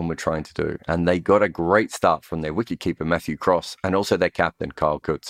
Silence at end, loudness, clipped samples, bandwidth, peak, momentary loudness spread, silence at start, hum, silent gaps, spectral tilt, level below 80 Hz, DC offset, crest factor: 0 s; -22 LUFS; under 0.1%; 16 kHz; -2 dBFS; 7 LU; 0 s; none; none; -6 dB/octave; -46 dBFS; under 0.1%; 20 dB